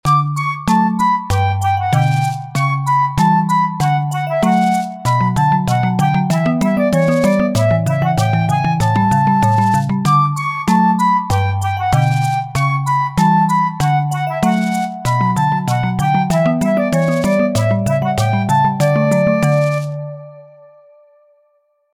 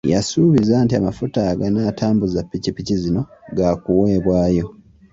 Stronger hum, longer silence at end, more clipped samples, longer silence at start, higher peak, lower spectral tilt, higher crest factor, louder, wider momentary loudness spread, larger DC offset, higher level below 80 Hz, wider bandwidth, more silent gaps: neither; first, 1.5 s vs 0.4 s; neither; about the same, 0.05 s vs 0.05 s; about the same, -2 dBFS vs -4 dBFS; about the same, -6.5 dB/octave vs -7 dB/octave; about the same, 12 dB vs 14 dB; first, -15 LUFS vs -18 LUFS; second, 4 LU vs 8 LU; neither; about the same, -42 dBFS vs -40 dBFS; first, 16 kHz vs 8 kHz; neither